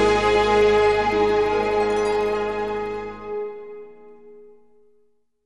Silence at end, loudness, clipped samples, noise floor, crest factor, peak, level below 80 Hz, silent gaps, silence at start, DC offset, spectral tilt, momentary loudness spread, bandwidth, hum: 1.05 s; -21 LUFS; under 0.1%; -64 dBFS; 14 dB; -6 dBFS; -42 dBFS; none; 0 s; 0.4%; -4.5 dB/octave; 15 LU; 11 kHz; none